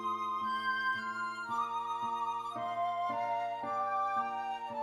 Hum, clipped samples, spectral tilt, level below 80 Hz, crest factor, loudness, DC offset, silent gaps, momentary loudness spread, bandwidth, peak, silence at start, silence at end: none; under 0.1%; -3.5 dB/octave; -80 dBFS; 12 dB; -35 LUFS; under 0.1%; none; 5 LU; 14.5 kHz; -22 dBFS; 0 s; 0 s